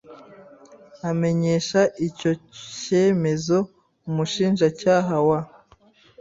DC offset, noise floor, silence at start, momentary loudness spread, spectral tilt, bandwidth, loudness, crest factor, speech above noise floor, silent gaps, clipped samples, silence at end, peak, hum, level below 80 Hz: under 0.1%; -55 dBFS; 0.1 s; 14 LU; -6 dB/octave; 7.8 kHz; -22 LUFS; 18 dB; 34 dB; none; under 0.1%; 0.75 s; -6 dBFS; none; -60 dBFS